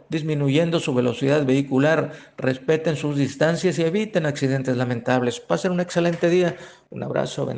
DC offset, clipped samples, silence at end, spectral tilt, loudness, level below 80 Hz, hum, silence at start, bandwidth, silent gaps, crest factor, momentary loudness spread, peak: under 0.1%; under 0.1%; 0 s; -6.5 dB/octave; -22 LUFS; -62 dBFS; none; 0.1 s; 9.6 kHz; none; 18 dB; 6 LU; -4 dBFS